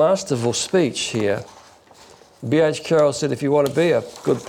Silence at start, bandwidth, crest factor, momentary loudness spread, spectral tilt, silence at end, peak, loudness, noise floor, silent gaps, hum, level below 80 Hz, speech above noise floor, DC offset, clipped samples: 0 s; 16.5 kHz; 12 dB; 5 LU; -5 dB/octave; 0 s; -8 dBFS; -20 LUFS; -48 dBFS; none; none; -62 dBFS; 29 dB; under 0.1%; under 0.1%